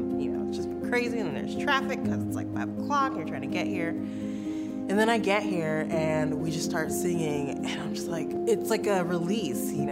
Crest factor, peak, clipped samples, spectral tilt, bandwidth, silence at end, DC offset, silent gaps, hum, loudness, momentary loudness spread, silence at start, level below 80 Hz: 18 dB; -10 dBFS; under 0.1%; -5.5 dB/octave; 16 kHz; 0 s; under 0.1%; none; none; -29 LUFS; 6 LU; 0 s; -60 dBFS